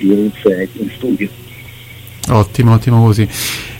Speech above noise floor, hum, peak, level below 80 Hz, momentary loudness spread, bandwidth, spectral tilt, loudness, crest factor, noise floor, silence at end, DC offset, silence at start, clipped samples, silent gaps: 21 dB; none; 0 dBFS; -38 dBFS; 23 LU; 16.5 kHz; -6.5 dB/octave; -13 LUFS; 14 dB; -33 dBFS; 0 s; under 0.1%; 0 s; under 0.1%; none